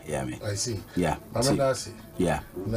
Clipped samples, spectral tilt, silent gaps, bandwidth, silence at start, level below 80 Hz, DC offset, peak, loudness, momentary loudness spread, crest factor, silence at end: under 0.1%; -5 dB/octave; none; 15.5 kHz; 0 s; -46 dBFS; under 0.1%; -12 dBFS; -28 LUFS; 8 LU; 18 dB; 0 s